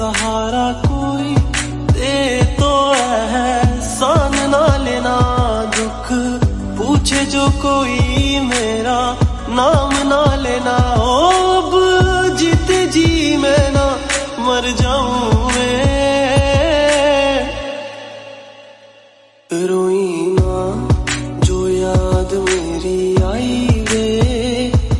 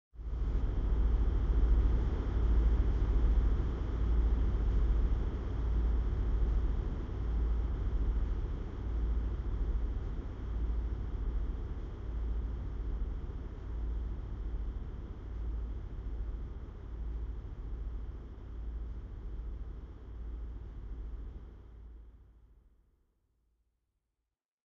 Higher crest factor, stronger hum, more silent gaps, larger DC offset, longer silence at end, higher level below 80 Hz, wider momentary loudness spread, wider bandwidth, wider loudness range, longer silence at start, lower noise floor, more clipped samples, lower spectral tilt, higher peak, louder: about the same, 14 dB vs 16 dB; neither; neither; neither; second, 0 s vs 2.2 s; first, -24 dBFS vs -34 dBFS; second, 6 LU vs 14 LU; first, 11.5 kHz vs 3.7 kHz; second, 5 LU vs 14 LU; second, 0 s vs 0.15 s; second, -47 dBFS vs -89 dBFS; neither; second, -5 dB/octave vs -8.5 dB/octave; first, 0 dBFS vs -18 dBFS; first, -15 LUFS vs -37 LUFS